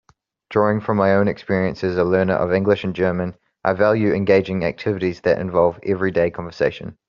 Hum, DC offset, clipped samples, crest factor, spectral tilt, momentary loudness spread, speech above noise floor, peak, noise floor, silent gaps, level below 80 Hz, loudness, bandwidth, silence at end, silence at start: none; under 0.1%; under 0.1%; 16 dB; -6 dB/octave; 6 LU; 28 dB; -2 dBFS; -47 dBFS; none; -52 dBFS; -20 LUFS; 7 kHz; 0.15 s; 0.5 s